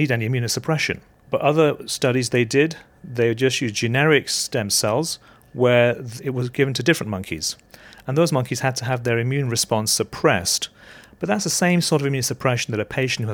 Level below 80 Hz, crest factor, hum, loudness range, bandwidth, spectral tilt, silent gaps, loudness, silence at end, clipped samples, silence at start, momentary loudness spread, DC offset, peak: -56 dBFS; 20 dB; none; 3 LU; 19.5 kHz; -4 dB/octave; none; -21 LUFS; 0 s; under 0.1%; 0 s; 10 LU; under 0.1%; -2 dBFS